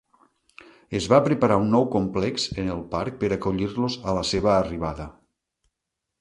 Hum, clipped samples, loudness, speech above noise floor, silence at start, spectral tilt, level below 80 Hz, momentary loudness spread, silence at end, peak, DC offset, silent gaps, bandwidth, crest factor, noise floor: none; under 0.1%; -24 LUFS; 60 dB; 0.9 s; -6 dB/octave; -46 dBFS; 11 LU; 1.1 s; -4 dBFS; under 0.1%; none; 11.5 kHz; 22 dB; -83 dBFS